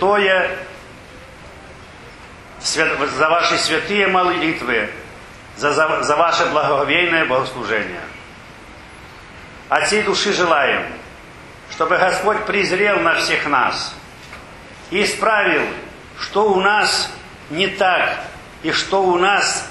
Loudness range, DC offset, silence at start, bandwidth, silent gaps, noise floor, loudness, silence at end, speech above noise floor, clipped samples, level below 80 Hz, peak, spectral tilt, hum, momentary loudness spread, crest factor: 3 LU; under 0.1%; 0 s; 12.5 kHz; none; -39 dBFS; -17 LUFS; 0 s; 22 dB; under 0.1%; -48 dBFS; 0 dBFS; -3 dB/octave; none; 23 LU; 18 dB